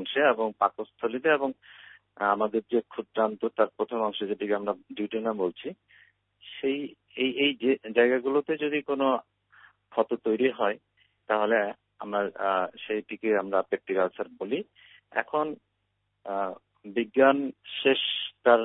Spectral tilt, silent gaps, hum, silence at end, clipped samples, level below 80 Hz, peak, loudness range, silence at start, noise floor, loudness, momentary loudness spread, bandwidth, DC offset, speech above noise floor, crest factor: -8.5 dB/octave; none; 50 Hz at -80 dBFS; 0 s; under 0.1%; -76 dBFS; -6 dBFS; 4 LU; 0 s; -77 dBFS; -28 LUFS; 11 LU; 4 kHz; under 0.1%; 50 dB; 22 dB